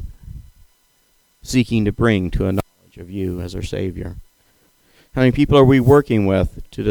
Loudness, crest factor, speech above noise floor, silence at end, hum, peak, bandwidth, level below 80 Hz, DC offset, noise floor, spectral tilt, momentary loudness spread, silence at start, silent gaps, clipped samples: -17 LUFS; 18 dB; 43 dB; 0 s; none; 0 dBFS; 19.5 kHz; -34 dBFS; under 0.1%; -60 dBFS; -7 dB/octave; 20 LU; 0 s; none; under 0.1%